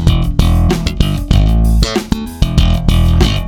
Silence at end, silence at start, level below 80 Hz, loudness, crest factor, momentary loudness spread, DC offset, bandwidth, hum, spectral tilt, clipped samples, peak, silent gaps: 0 s; 0 s; -14 dBFS; -13 LUFS; 10 dB; 5 LU; under 0.1%; 16.5 kHz; none; -6 dB/octave; 0.4%; 0 dBFS; none